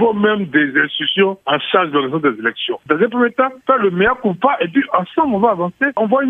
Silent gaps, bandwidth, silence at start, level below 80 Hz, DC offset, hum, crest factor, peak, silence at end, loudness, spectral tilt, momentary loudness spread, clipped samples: none; 4 kHz; 0 s; -52 dBFS; under 0.1%; none; 16 dB; 0 dBFS; 0 s; -16 LUFS; -8 dB/octave; 3 LU; under 0.1%